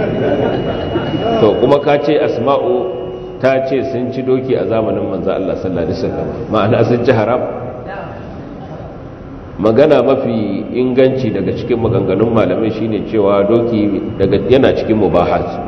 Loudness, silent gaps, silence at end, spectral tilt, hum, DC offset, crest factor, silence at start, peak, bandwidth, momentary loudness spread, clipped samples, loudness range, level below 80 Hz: -14 LUFS; none; 0 s; -8.5 dB/octave; none; under 0.1%; 14 dB; 0 s; 0 dBFS; 6.4 kHz; 15 LU; 0.1%; 3 LU; -38 dBFS